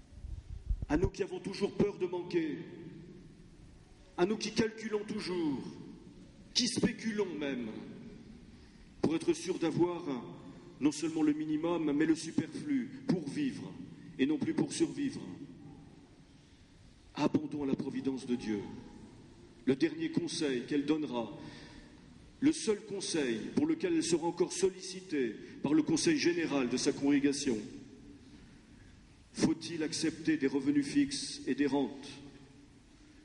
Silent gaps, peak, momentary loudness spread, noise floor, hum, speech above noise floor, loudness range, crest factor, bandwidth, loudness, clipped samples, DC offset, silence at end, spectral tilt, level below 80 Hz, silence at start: none; -14 dBFS; 19 LU; -59 dBFS; none; 26 dB; 6 LU; 20 dB; 11.5 kHz; -34 LUFS; under 0.1%; under 0.1%; 0.6 s; -4.5 dB/octave; -54 dBFS; 0.1 s